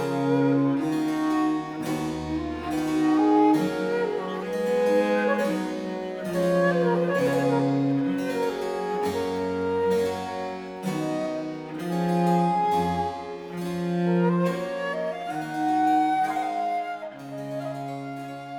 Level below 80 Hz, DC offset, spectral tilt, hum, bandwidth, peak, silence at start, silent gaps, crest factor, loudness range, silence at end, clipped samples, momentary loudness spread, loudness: -56 dBFS; under 0.1%; -7 dB/octave; none; 18.5 kHz; -10 dBFS; 0 s; none; 16 dB; 3 LU; 0 s; under 0.1%; 11 LU; -25 LUFS